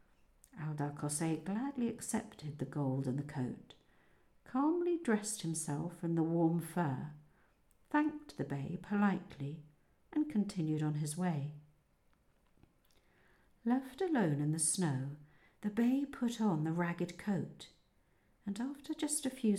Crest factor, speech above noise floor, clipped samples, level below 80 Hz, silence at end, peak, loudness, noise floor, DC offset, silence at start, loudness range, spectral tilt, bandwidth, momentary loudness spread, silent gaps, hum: 18 dB; 36 dB; under 0.1%; -72 dBFS; 0 s; -20 dBFS; -37 LUFS; -72 dBFS; under 0.1%; 0.55 s; 4 LU; -5.5 dB/octave; 16 kHz; 12 LU; none; none